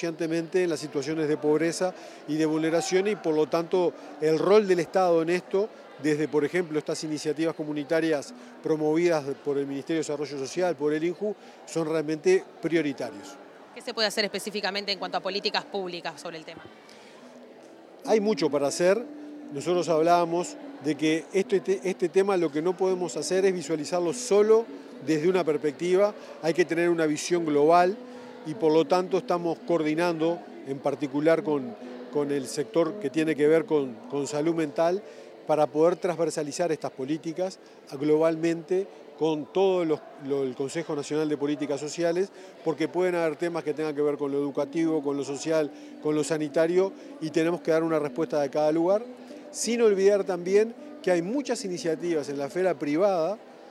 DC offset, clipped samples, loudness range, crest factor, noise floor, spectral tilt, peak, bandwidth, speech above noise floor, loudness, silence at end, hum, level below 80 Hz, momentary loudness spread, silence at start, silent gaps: under 0.1%; under 0.1%; 4 LU; 20 dB; -49 dBFS; -5 dB/octave; -8 dBFS; 13.5 kHz; 23 dB; -26 LUFS; 0 s; none; -84 dBFS; 10 LU; 0 s; none